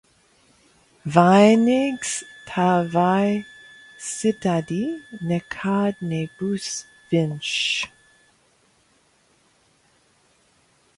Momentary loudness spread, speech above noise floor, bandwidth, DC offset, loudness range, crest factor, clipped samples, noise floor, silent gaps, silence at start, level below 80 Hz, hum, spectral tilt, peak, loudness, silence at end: 15 LU; 41 dB; 11.5 kHz; under 0.1%; 8 LU; 22 dB; under 0.1%; -61 dBFS; none; 1.05 s; -62 dBFS; none; -5 dB/octave; 0 dBFS; -21 LUFS; 3.1 s